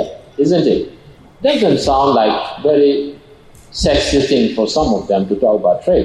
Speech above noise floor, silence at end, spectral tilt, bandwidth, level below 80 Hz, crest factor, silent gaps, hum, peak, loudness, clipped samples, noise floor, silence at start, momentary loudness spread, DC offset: 28 dB; 0 s; -5.5 dB/octave; 11.5 kHz; -34 dBFS; 12 dB; none; none; -4 dBFS; -14 LUFS; under 0.1%; -42 dBFS; 0 s; 7 LU; under 0.1%